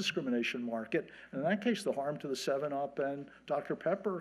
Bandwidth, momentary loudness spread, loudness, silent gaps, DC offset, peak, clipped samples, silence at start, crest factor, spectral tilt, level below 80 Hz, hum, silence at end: 13 kHz; 5 LU; -36 LUFS; none; under 0.1%; -18 dBFS; under 0.1%; 0 s; 18 dB; -5 dB/octave; -76 dBFS; none; 0 s